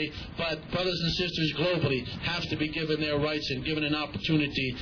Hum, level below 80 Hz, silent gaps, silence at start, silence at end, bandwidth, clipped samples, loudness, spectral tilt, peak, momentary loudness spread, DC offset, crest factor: none; -48 dBFS; none; 0 s; 0 s; 5.4 kHz; under 0.1%; -29 LUFS; -6 dB/octave; -14 dBFS; 4 LU; under 0.1%; 16 dB